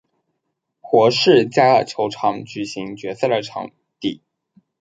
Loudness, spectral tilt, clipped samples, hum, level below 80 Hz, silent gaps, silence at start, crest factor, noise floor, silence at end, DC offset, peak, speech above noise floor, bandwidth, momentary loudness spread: -18 LUFS; -5 dB/octave; under 0.1%; none; -64 dBFS; none; 0.85 s; 18 dB; -76 dBFS; 0.65 s; under 0.1%; 0 dBFS; 59 dB; 9.2 kHz; 16 LU